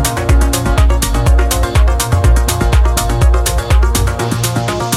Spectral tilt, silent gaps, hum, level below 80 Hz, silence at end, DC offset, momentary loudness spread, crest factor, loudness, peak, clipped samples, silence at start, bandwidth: -4.5 dB/octave; none; none; -12 dBFS; 0 s; 0.2%; 3 LU; 10 dB; -13 LUFS; 0 dBFS; under 0.1%; 0 s; 16 kHz